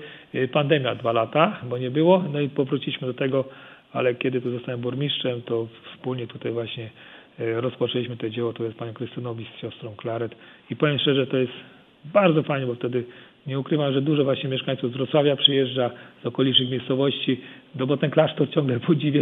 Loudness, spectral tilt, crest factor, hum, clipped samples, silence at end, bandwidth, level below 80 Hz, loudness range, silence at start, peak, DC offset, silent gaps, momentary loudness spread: -24 LUFS; -9 dB/octave; 22 dB; none; under 0.1%; 0 s; 4.3 kHz; -70 dBFS; 7 LU; 0 s; -2 dBFS; under 0.1%; none; 14 LU